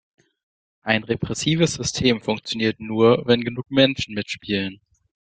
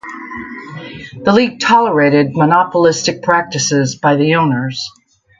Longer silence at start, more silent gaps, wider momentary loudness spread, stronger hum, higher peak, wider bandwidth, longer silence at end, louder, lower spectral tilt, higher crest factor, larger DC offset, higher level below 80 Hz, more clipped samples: first, 0.85 s vs 0.05 s; neither; second, 9 LU vs 16 LU; neither; about the same, -2 dBFS vs 0 dBFS; about the same, 9.4 kHz vs 9.4 kHz; about the same, 0.55 s vs 0.5 s; second, -21 LUFS vs -13 LUFS; about the same, -4.5 dB/octave vs -4.5 dB/octave; first, 20 dB vs 14 dB; neither; about the same, -52 dBFS vs -52 dBFS; neither